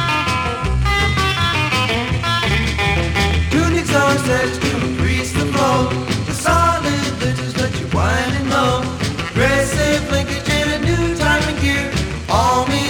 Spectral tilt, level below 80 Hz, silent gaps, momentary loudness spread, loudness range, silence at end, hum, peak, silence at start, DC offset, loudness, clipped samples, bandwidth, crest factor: -4.5 dB/octave; -28 dBFS; none; 5 LU; 1 LU; 0 s; none; -2 dBFS; 0 s; under 0.1%; -17 LUFS; under 0.1%; 19 kHz; 14 dB